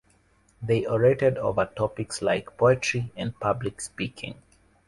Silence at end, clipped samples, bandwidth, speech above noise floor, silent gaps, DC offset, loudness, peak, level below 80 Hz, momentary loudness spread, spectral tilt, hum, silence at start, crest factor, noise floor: 0.55 s; under 0.1%; 11.5 kHz; 37 dB; none; under 0.1%; -26 LUFS; -8 dBFS; -54 dBFS; 12 LU; -5.5 dB/octave; none; 0.6 s; 20 dB; -63 dBFS